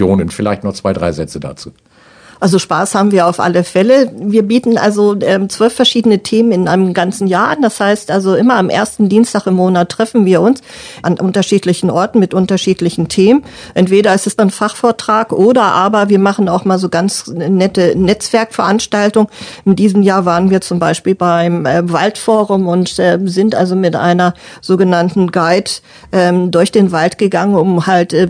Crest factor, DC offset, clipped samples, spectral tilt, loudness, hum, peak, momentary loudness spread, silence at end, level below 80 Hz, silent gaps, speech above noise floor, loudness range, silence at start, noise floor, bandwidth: 12 dB; under 0.1%; 0.2%; -5.5 dB/octave; -12 LUFS; none; 0 dBFS; 6 LU; 0 s; -46 dBFS; none; 30 dB; 2 LU; 0 s; -41 dBFS; 10 kHz